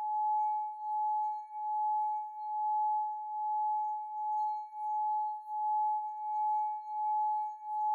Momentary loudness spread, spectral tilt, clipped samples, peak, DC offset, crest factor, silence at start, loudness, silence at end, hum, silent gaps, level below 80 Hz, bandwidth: 5 LU; 1.5 dB/octave; under 0.1%; -28 dBFS; under 0.1%; 6 dB; 0 s; -34 LUFS; 0 s; none; none; under -90 dBFS; 4.1 kHz